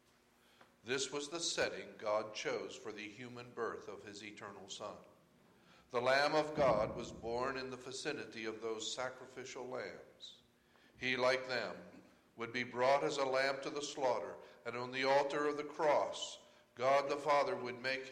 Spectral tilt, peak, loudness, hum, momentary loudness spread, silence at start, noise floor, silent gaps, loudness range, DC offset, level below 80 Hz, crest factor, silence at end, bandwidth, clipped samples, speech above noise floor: -3 dB/octave; -20 dBFS; -38 LUFS; none; 16 LU; 0.85 s; -70 dBFS; none; 8 LU; under 0.1%; -72 dBFS; 20 dB; 0 s; 13 kHz; under 0.1%; 32 dB